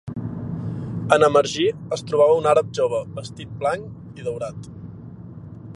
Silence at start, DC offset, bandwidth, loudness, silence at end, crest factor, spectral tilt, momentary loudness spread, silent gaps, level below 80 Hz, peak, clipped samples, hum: 0.05 s; under 0.1%; 11 kHz; -21 LUFS; 0 s; 22 dB; -5.5 dB/octave; 22 LU; none; -52 dBFS; -2 dBFS; under 0.1%; none